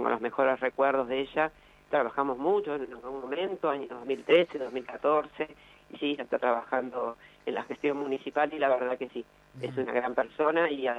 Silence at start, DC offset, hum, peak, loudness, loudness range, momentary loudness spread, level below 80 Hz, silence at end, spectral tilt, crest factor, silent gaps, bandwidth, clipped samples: 0 s; under 0.1%; none; -10 dBFS; -30 LUFS; 2 LU; 11 LU; -68 dBFS; 0 s; -6 dB/octave; 20 dB; none; 8.8 kHz; under 0.1%